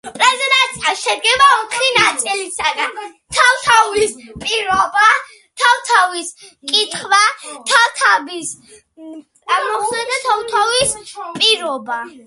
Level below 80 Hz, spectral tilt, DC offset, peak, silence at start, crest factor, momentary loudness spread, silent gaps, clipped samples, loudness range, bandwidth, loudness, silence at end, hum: -52 dBFS; 0 dB/octave; under 0.1%; 0 dBFS; 0.05 s; 16 dB; 14 LU; none; under 0.1%; 3 LU; 12 kHz; -14 LUFS; 0.05 s; none